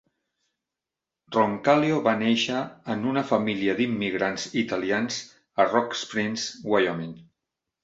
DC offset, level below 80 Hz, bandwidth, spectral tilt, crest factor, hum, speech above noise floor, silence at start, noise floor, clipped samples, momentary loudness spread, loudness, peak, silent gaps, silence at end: under 0.1%; -66 dBFS; 8 kHz; -4.5 dB/octave; 22 dB; none; 63 dB; 1.3 s; -88 dBFS; under 0.1%; 9 LU; -25 LUFS; -4 dBFS; none; 0.6 s